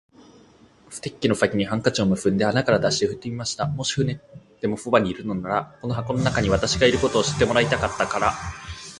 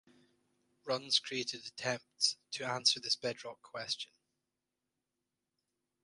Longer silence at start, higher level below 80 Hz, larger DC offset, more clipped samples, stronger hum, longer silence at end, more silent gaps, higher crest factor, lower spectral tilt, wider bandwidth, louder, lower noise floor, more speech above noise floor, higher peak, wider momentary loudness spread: about the same, 0.9 s vs 0.85 s; first, -44 dBFS vs -84 dBFS; neither; neither; neither; second, 0 s vs 2 s; neither; second, 20 dB vs 26 dB; first, -4.5 dB/octave vs -1.5 dB/octave; about the same, 11.5 kHz vs 11.5 kHz; first, -22 LUFS vs -35 LUFS; second, -53 dBFS vs -89 dBFS; second, 30 dB vs 51 dB; first, -2 dBFS vs -14 dBFS; second, 10 LU vs 15 LU